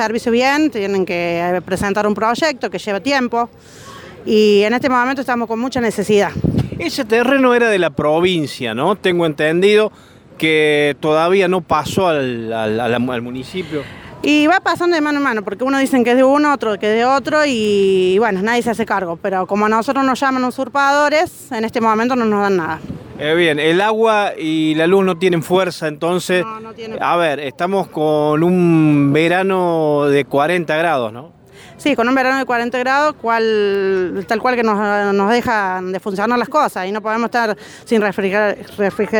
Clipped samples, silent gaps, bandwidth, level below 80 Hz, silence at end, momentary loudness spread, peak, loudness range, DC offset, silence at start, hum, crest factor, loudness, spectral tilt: under 0.1%; none; 20 kHz; -50 dBFS; 0 s; 8 LU; -2 dBFS; 3 LU; under 0.1%; 0 s; none; 14 dB; -16 LUFS; -5.5 dB/octave